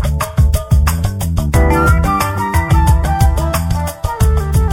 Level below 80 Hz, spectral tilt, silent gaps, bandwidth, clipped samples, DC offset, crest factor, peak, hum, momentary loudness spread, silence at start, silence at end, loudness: -16 dBFS; -6 dB/octave; none; 17 kHz; under 0.1%; under 0.1%; 12 dB; 0 dBFS; none; 6 LU; 0 s; 0 s; -14 LUFS